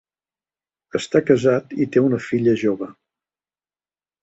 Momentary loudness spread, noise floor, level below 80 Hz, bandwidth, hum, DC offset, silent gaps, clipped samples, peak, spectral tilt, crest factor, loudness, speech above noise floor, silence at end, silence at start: 11 LU; under -90 dBFS; -60 dBFS; 8.2 kHz; 50 Hz at -55 dBFS; under 0.1%; none; under 0.1%; -2 dBFS; -7 dB/octave; 20 dB; -20 LUFS; over 71 dB; 1.3 s; 0.95 s